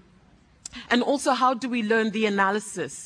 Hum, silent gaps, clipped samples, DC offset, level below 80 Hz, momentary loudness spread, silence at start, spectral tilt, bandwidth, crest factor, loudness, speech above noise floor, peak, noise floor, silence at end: none; none; under 0.1%; under 0.1%; -64 dBFS; 15 LU; 0.75 s; -4 dB/octave; 10.5 kHz; 18 dB; -24 LUFS; 33 dB; -6 dBFS; -57 dBFS; 0 s